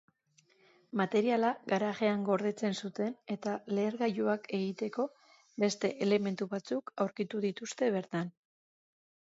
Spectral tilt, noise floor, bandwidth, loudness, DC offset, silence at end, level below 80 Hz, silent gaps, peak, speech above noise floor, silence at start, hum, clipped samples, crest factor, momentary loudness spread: -5.5 dB/octave; -70 dBFS; 8 kHz; -34 LUFS; under 0.1%; 0.95 s; -82 dBFS; none; -16 dBFS; 37 dB; 0.95 s; none; under 0.1%; 18 dB; 8 LU